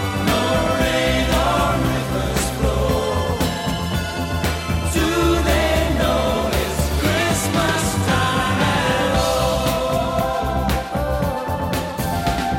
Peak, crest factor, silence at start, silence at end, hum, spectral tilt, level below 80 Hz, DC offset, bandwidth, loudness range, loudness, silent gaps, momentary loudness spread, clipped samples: -6 dBFS; 12 dB; 0 s; 0 s; none; -5 dB/octave; -28 dBFS; under 0.1%; 17 kHz; 2 LU; -19 LUFS; none; 5 LU; under 0.1%